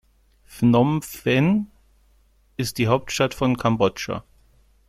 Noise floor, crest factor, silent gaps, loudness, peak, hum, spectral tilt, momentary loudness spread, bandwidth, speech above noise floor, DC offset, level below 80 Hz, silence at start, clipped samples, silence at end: -59 dBFS; 18 dB; none; -22 LUFS; -6 dBFS; none; -6 dB/octave; 12 LU; 16 kHz; 38 dB; under 0.1%; -50 dBFS; 0.5 s; under 0.1%; 0.7 s